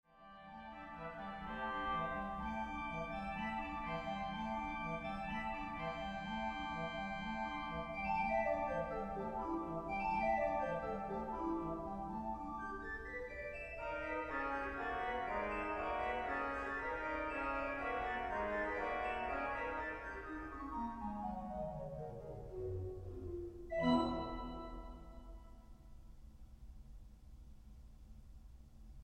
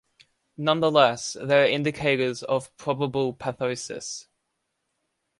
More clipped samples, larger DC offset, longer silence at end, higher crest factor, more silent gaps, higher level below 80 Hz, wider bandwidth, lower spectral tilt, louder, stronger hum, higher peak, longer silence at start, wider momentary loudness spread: neither; neither; second, 0 s vs 1.2 s; about the same, 20 dB vs 22 dB; neither; first, -56 dBFS vs -64 dBFS; first, 13 kHz vs 11.5 kHz; first, -6.5 dB/octave vs -4.5 dB/octave; second, -42 LUFS vs -24 LUFS; neither; second, -22 dBFS vs -4 dBFS; second, 0.1 s vs 0.6 s; first, 22 LU vs 12 LU